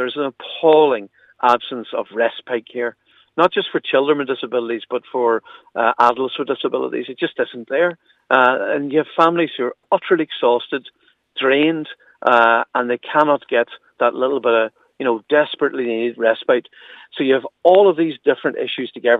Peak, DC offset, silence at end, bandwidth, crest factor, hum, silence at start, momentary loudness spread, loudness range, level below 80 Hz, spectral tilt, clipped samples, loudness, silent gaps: 0 dBFS; under 0.1%; 0 s; 7.2 kHz; 18 dB; none; 0 s; 11 LU; 3 LU; -74 dBFS; -6.5 dB/octave; under 0.1%; -18 LUFS; none